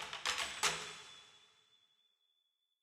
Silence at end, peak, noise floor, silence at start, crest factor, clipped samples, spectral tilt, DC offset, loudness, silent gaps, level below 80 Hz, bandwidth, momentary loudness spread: 1.4 s; -18 dBFS; -83 dBFS; 0 s; 26 dB; under 0.1%; 0.5 dB/octave; under 0.1%; -38 LUFS; none; -74 dBFS; 16 kHz; 19 LU